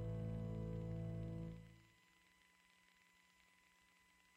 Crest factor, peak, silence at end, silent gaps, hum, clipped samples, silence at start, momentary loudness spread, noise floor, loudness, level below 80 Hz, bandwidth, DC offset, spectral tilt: 14 dB; -36 dBFS; 2.45 s; none; none; under 0.1%; 0 s; 14 LU; -74 dBFS; -48 LUFS; -62 dBFS; 10.5 kHz; under 0.1%; -8.5 dB/octave